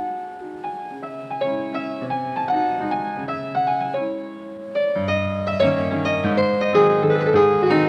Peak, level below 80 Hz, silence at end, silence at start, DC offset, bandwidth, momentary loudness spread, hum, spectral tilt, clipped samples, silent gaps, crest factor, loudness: -4 dBFS; -62 dBFS; 0 s; 0 s; under 0.1%; 8.2 kHz; 15 LU; none; -7.5 dB/octave; under 0.1%; none; 18 dB; -21 LUFS